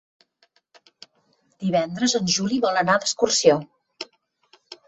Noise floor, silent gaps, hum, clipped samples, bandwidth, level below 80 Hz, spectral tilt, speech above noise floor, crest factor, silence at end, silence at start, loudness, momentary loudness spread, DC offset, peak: -66 dBFS; none; none; under 0.1%; 8.4 kHz; -64 dBFS; -3.5 dB/octave; 45 dB; 22 dB; 0.15 s; 1.6 s; -21 LUFS; 20 LU; under 0.1%; -2 dBFS